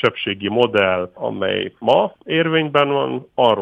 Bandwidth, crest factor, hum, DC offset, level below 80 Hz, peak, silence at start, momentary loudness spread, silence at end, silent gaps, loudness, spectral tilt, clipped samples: 7.6 kHz; 16 dB; none; under 0.1%; -62 dBFS; -2 dBFS; 0 s; 7 LU; 0 s; none; -18 LUFS; -7 dB/octave; under 0.1%